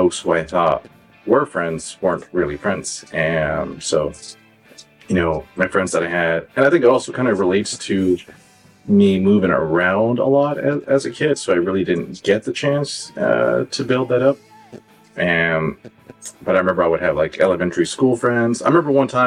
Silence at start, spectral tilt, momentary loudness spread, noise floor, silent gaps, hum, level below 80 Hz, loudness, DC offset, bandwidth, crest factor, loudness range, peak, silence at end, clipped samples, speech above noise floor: 0 s; -5.5 dB/octave; 8 LU; -46 dBFS; none; none; -48 dBFS; -18 LUFS; under 0.1%; 11.5 kHz; 16 dB; 4 LU; -4 dBFS; 0 s; under 0.1%; 29 dB